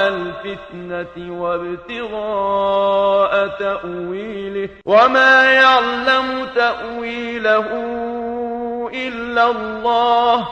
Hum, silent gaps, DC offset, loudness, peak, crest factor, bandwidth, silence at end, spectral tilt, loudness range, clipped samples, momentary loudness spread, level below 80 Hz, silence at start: none; none; under 0.1%; -16 LUFS; 0 dBFS; 18 dB; 9 kHz; 0 s; -4.5 dB/octave; 6 LU; under 0.1%; 16 LU; -50 dBFS; 0 s